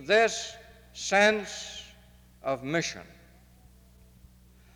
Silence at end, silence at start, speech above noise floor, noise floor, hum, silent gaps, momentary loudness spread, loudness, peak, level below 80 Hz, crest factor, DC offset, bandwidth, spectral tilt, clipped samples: 1.7 s; 0 s; 29 dB; -56 dBFS; 60 Hz at -70 dBFS; none; 23 LU; -27 LUFS; -10 dBFS; -58 dBFS; 20 dB; under 0.1%; 20 kHz; -3 dB/octave; under 0.1%